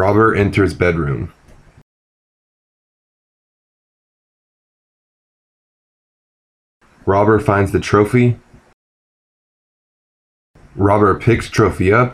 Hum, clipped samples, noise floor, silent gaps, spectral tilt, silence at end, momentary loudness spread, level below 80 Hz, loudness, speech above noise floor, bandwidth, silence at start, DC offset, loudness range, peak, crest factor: none; under 0.1%; under -90 dBFS; 1.82-6.81 s, 8.74-10.54 s; -7.5 dB/octave; 0 s; 9 LU; -42 dBFS; -15 LUFS; over 76 dB; 13 kHz; 0 s; under 0.1%; 7 LU; 0 dBFS; 18 dB